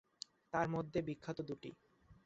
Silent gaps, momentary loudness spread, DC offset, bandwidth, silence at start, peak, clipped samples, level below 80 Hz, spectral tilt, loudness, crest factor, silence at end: none; 15 LU; under 0.1%; 8 kHz; 0.55 s; -22 dBFS; under 0.1%; -70 dBFS; -5.5 dB/octave; -42 LUFS; 22 dB; 0.1 s